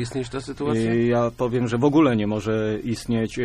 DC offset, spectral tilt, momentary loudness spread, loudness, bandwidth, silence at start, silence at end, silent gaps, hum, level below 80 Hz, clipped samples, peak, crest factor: under 0.1%; -7 dB/octave; 10 LU; -22 LUFS; 13 kHz; 0 s; 0 s; none; none; -46 dBFS; under 0.1%; -6 dBFS; 16 dB